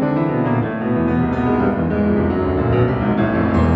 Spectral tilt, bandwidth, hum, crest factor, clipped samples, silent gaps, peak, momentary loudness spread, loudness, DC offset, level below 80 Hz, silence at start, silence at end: -10 dB/octave; 5.4 kHz; none; 12 dB; under 0.1%; none; -4 dBFS; 2 LU; -18 LUFS; under 0.1%; -32 dBFS; 0 s; 0 s